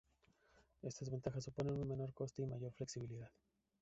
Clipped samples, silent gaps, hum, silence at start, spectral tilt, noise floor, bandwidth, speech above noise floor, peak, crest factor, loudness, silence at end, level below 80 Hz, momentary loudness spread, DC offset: under 0.1%; none; none; 0.55 s; -8 dB/octave; -76 dBFS; 8 kHz; 31 dB; -28 dBFS; 20 dB; -46 LUFS; 0.5 s; -68 dBFS; 9 LU; under 0.1%